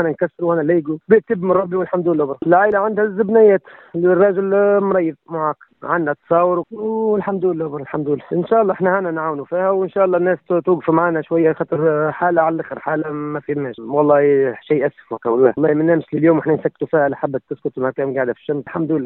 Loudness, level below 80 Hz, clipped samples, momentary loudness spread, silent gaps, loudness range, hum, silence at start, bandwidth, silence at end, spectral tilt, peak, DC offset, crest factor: -17 LUFS; -62 dBFS; under 0.1%; 9 LU; none; 3 LU; none; 0 s; 4 kHz; 0 s; -12 dB/octave; 0 dBFS; under 0.1%; 16 dB